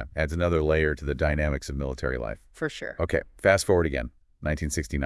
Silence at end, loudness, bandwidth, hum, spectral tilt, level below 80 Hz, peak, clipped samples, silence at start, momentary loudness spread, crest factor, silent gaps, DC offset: 0 s; -27 LUFS; 12 kHz; none; -5.5 dB/octave; -36 dBFS; -6 dBFS; under 0.1%; 0 s; 11 LU; 20 dB; none; under 0.1%